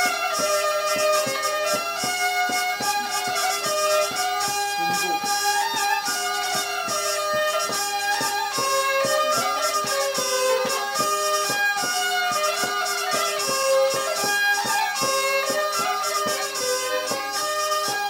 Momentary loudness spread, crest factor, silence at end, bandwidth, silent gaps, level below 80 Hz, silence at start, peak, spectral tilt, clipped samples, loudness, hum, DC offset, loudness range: 3 LU; 14 dB; 0 s; 16.5 kHz; none; -68 dBFS; 0 s; -10 dBFS; -0.5 dB/octave; under 0.1%; -22 LUFS; none; under 0.1%; 1 LU